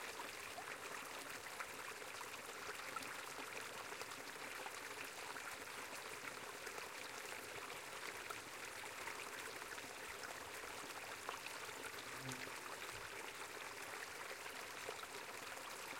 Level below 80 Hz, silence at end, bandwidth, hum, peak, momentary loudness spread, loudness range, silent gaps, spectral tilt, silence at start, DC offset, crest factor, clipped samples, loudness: -80 dBFS; 0 s; 16.5 kHz; none; -30 dBFS; 1 LU; 0 LU; none; -1.5 dB/octave; 0 s; under 0.1%; 20 dB; under 0.1%; -49 LUFS